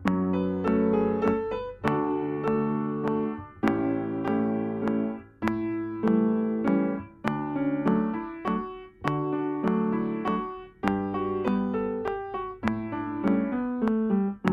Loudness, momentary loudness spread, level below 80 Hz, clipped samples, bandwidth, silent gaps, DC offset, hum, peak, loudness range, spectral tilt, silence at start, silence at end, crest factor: -28 LUFS; 7 LU; -54 dBFS; under 0.1%; 6.8 kHz; none; under 0.1%; none; -4 dBFS; 2 LU; -9 dB/octave; 0 s; 0 s; 22 dB